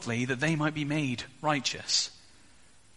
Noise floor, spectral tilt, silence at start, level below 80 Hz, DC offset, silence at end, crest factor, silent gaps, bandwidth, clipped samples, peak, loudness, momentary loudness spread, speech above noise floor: -60 dBFS; -3.5 dB/octave; 0 s; -64 dBFS; 0.1%; 0.8 s; 20 dB; none; 11.5 kHz; under 0.1%; -12 dBFS; -29 LUFS; 6 LU; 30 dB